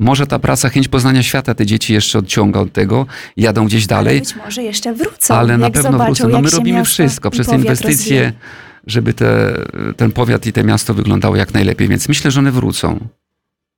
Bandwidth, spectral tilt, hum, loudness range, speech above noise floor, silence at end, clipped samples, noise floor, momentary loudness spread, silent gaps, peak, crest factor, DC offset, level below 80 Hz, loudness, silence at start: 18.5 kHz; -5 dB/octave; none; 2 LU; 63 dB; 0.7 s; under 0.1%; -76 dBFS; 7 LU; none; 0 dBFS; 12 dB; under 0.1%; -36 dBFS; -13 LUFS; 0 s